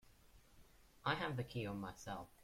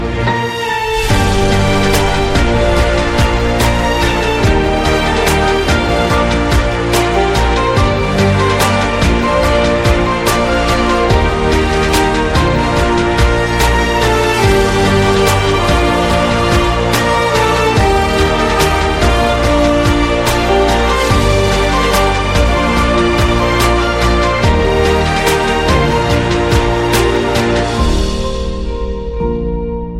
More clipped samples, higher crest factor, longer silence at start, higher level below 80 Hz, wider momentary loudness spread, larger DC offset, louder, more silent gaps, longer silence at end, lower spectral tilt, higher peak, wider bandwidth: neither; first, 22 dB vs 12 dB; about the same, 0.05 s vs 0 s; second, -68 dBFS vs -18 dBFS; first, 9 LU vs 2 LU; neither; second, -44 LUFS vs -12 LUFS; neither; about the same, 0 s vs 0 s; about the same, -5.5 dB/octave vs -5 dB/octave; second, -24 dBFS vs 0 dBFS; about the same, 16.5 kHz vs 16.5 kHz